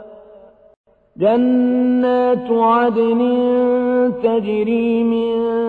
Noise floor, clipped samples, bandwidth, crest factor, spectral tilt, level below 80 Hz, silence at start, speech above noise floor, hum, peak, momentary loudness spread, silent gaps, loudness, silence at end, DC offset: -44 dBFS; under 0.1%; 4.5 kHz; 12 dB; -9 dB/octave; -56 dBFS; 0 s; 29 dB; none; -4 dBFS; 4 LU; 0.77-0.84 s; -16 LUFS; 0 s; under 0.1%